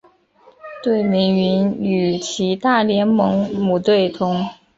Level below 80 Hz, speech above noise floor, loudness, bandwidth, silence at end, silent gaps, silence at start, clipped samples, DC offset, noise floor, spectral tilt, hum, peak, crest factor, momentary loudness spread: -56 dBFS; 35 dB; -18 LUFS; 7.8 kHz; 0.25 s; none; 0.65 s; under 0.1%; under 0.1%; -52 dBFS; -6 dB/octave; none; -2 dBFS; 16 dB; 5 LU